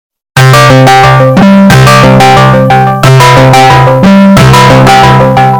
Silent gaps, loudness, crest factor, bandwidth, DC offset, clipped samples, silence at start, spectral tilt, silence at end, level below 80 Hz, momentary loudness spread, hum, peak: none; -2 LUFS; 2 dB; over 20 kHz; under 0.1%; 60%; 0.35 s; -6 dB/octave; 0 s; -24 dBFS; 3 LU; none; 0 dBFS